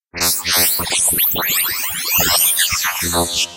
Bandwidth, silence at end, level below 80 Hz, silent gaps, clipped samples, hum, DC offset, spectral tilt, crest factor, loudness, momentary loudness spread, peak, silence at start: 16.5 kHz; 0 s; -42 dBFS; none; under 0.1%; none; 0.2%; -0.5 dB/octave; 16 dB; -14 LUFS; 5 LU; -2 dBFS; 0.15 s